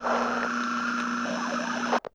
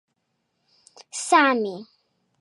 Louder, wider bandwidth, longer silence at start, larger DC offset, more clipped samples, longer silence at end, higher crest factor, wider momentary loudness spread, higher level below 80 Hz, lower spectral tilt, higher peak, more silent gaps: second, -28 LUFS vs -21 LUFS; about the same, 10.5 kHz vs 11.5 kHz; second, 0 s vs 1.15 s; neither; neither; second, 0.05 s vs 0.6 s; second, 16 dB vs 22 dB; second, 3 LU vs 18 LU; first, -66 dBFS vs -86 dBFS; about the same, -3.5 dB/octave vs -2.5 dB/octave; second, -12 dBFS vs -4 dBFS; neither